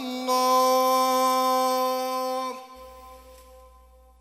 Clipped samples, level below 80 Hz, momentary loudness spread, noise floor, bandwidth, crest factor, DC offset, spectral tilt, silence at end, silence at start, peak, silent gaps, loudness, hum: under 0.1%; -58 dBFS; 16 LU; -53 dBFS; 16.5 kHz; 14 dB; under 0.1%; -1.5 dB/octave; 0.85 s; 0 s; -10 dBFS; none; -23 LUFS; none